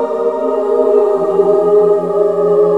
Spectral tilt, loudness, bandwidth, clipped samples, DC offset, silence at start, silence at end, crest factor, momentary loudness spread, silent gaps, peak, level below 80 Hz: -8.5 dB/octave; -12 LUFS; 4.5 kHz; under 0.1%; 0.4%; 0 s; 0 s; 12 dB; 5 LU; none; 0 dBFS; -60 dBFS